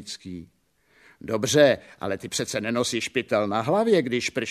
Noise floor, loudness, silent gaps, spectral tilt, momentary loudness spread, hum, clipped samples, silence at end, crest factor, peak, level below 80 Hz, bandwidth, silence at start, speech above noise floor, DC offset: -61 dBFS; -24 LUFS; none; -4 dB/octave; 17 LU; none; under 0.1%; 0 s; 20 dB; -4 dBFS; -62 dBFS; 14 kHz; 0 s; 37 dB; under 0.1%